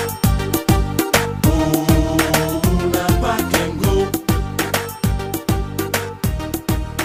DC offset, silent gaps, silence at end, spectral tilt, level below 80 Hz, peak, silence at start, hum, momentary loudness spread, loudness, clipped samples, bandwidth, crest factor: under 0.1%; none; 0 s; -5 dB/octave; -26 dBFS; -2 dBFS; 0 s; none; 6 LU; -18 LUFS; under 0.1%; 16.5 kHz; 16 dB